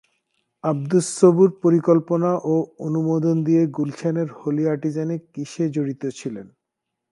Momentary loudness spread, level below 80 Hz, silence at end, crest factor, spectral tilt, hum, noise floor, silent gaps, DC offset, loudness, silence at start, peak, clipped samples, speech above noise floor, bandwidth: 12 LU; -70 dBFS; 0.65 s; 20 dB; -7.5 dB/octave; none; -81 dBFS; none; under 0.1%; -21 LUFS; 0.65 s; -2 dBFS; under 0.1%; 61 dB; 11.5 kHz